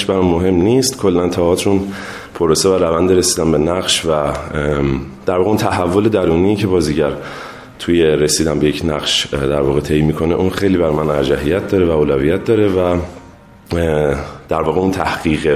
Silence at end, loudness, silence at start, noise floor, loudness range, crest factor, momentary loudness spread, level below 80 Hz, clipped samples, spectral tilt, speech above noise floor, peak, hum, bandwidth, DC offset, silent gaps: 0 s; -15 LUFS; 0 s; -40 dBFS; 2 LU; 14 dB; 7 LU; -32 dBFS; under 0.1%; -5 dB/octave; 25 dB; 0 dBFS; none; 15.5 kHz; under 0.1%; none